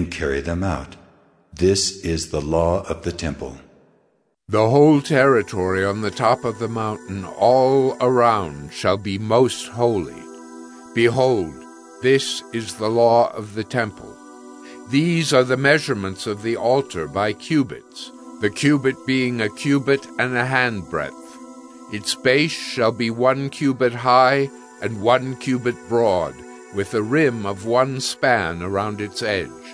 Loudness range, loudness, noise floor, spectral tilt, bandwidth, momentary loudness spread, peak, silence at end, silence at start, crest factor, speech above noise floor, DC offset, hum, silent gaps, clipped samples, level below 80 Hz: 3 LU; -20 LUFS; -64 dBFS; -5 dB/octave; 11 kHz; 15 LU; -2 dBFS; 0 s; 0 s; 20 dB; 44 dB; under 0.1%; none; none; under 0.1%; -46 dBFS